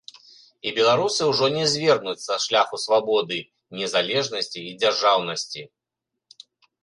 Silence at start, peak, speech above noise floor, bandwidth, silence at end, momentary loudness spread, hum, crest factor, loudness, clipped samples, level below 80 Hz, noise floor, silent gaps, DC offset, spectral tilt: 0.65 s; -4 dBFS; 62 dB; 11.5 kHz; 1.15 s; 11 LU; none; 20 dB; -22 LUFS; under 0.1%; -70 dBFS; -84 dBFS; none; under 0.1%; -3 dB/octave